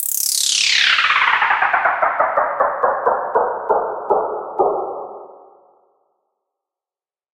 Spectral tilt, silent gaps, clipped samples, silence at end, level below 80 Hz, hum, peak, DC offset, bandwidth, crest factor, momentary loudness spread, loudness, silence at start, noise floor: 1 dB/octave; none; under 0.1%; 2.05 s; -60 dBFS; none; -2 dBFS; under 0.1%; 17 kHz; 18 dB; 8 LU; -16 LUFS; 0 s; under -90 dBFS